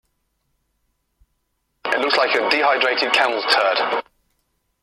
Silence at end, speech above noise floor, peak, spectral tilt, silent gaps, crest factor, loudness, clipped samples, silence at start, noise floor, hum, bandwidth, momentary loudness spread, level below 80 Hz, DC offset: 0.8 s; 53 dB; -2 dBFS; -1.5 dB/octave; none; 20 dB; -18 LUFS; under 0.1%; 1.85 s; -71 dBFS; none; 14.5 kHz; 7 LU; -66 dBFS; under 0.1%